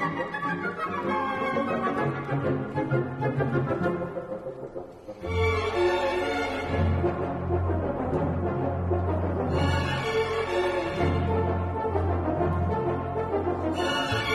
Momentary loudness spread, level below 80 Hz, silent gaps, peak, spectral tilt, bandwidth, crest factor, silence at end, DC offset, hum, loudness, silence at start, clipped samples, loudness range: 5 LU; -44 dBFS; none; -12 dBFS; -7 dB/octave; 12 kHz; 14 dB; 0 s; under 0.1%; none; -27 LUFS; 0 s; under 0.1%; 2 LU